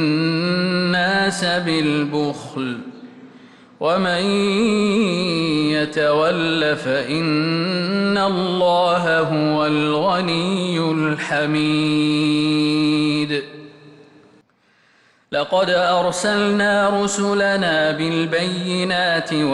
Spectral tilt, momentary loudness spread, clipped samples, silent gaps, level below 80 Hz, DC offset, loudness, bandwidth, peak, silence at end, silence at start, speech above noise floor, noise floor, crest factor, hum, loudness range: -5 dB/octave; 4 LU; under 0.1%; none; -58 dBFS; under 0.1%; -18 LUFS; 11.5 kHz; -8 dBFS; 0 s; 0 s; 40 dB; -58 dBFS; 12 dB; none; 3 LU